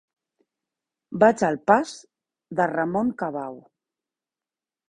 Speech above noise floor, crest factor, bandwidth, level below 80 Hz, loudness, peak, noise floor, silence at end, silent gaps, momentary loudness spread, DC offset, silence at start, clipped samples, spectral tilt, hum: over 68 dB; 24 dB; 11 kHz; -64 dBFS; -23 LUFS; -2 dBFS; under -90 dBFS; 1.3 s; none; 17 LU; under 0.1%; 1.1 s; under 0.1%; -6 dB/octave; none